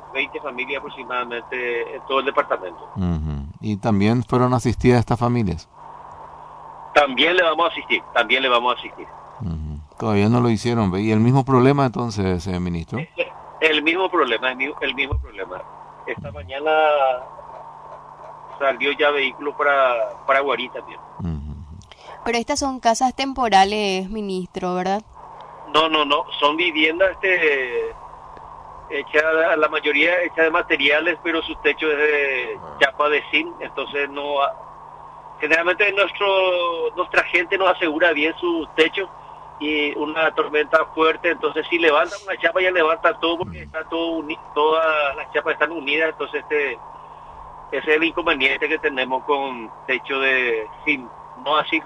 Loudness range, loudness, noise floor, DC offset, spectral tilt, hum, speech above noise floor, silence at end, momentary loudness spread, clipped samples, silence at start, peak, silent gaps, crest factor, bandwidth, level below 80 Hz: 4 LU; -20 LUFS; -40 dBFS; under 0.1%; -5 dB/octave; none; 20 dB; 0 s; 19 LU; under 0.1%; 0 s; -2 dBFS; none; 18 dB; 11 kHz; -44 dBFS